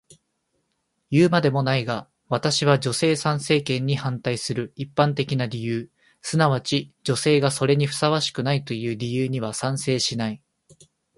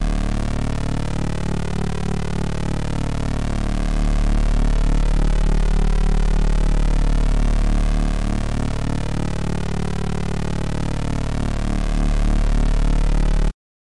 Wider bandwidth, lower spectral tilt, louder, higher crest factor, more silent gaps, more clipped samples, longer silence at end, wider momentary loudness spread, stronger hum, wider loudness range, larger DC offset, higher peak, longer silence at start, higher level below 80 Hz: about the same, 11.5 kHz vs 11 kHz; second, -5 dB/octave vs -6.5 dB/octave; about the same, -23 LUFS vs -23 LUFS; first, 20 dB vs 8 dB; neither; neither; first, 0.8 s vs 0.4 s; first, 9 LU vs 3 LU; neither; about the same, 3 LU vs 3 LU; neither; first, -2 dBFS vs -10 dBFS; first, 1.1 s vs 0 s; second, -60 dBFS vs -20 dBFS